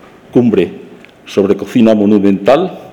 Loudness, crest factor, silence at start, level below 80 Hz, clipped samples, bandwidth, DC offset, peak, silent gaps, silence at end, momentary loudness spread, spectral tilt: -11 LUFS; 12 dB; 0.35 s; -52 dBFS; under 0.1%; 11 kHz; under 0.1%; 0 dBFS; none; 0 s; 6 LU; -7.5 dB/octave